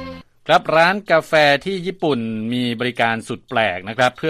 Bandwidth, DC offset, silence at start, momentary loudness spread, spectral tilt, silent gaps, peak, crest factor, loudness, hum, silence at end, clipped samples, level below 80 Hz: 15 kHz; under 0.1%; 0 s; 10 LU; -5 dB/octave; none; -2 dBFS; 18 dB; -18 LUFS; none; 0 s; under 0.1%; -56 dBFS